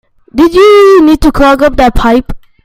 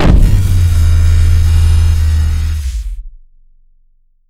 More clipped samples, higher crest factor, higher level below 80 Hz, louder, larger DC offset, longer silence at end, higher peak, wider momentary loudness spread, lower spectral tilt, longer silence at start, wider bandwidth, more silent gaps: first, 3% vs 0.5%; about the same, 6 dB vs 10 dB; second, -20 dBFS vs -12 dBFS; first, -6 LUFS vs -12 LUFS; neither; second, 0.25 s vs 1.2 s; about the same, 0 dBFS vs 0 dBFS; second, 7 LU vs 11 LU; about the same, -5.5 dB/octave vs -6.5 dB/octave; first, 0.35 s vs 0 s; first, 16 kHz vs 14.5 kHz; neither